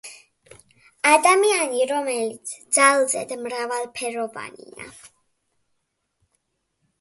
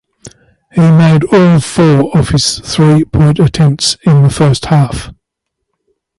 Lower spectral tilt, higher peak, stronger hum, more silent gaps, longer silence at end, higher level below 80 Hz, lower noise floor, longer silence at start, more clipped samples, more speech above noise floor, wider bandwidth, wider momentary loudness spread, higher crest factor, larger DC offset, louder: second, -1 dB/octave vs -6 dB/octave; about the same, -2 dBFS vs 0 dBFS; neither; neither; first, 1.95 s vs 1.05 s; second, -72 dBFS vs -32 dBFS; about the same, -75 dBFS vs -73 dBFS; second, 0.05 s vs 0.25 s; neither; second, 53 dB vs 64 dB; about the same, 12 kHz vs 11.5 kHz; first, 24 LU vs 4 LU; first, 22 dB vs 10 dB; neither; second, -20 LUFS vs -9 LUFS